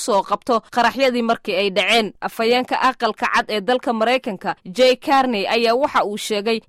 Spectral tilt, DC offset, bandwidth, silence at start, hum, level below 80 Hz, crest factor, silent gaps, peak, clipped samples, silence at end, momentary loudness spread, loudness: -3.5 dB/octave; under 0.1%; 16 kHz; 0 s; none; -56 dBFS; 14 dB; none; -4 dBFS; under 0.1%; 0.1 s; 5 LU; -18 LUFS